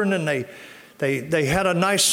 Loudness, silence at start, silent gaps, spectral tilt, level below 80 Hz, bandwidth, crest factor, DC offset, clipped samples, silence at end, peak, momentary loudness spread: -22 LUFS; 0 s; none; -3.5 dB/octave; -50 dBFS; 17 kHz; 16 dB; under 0.1%; under 0.1%; 0 s; -6 dBFS; 18 LU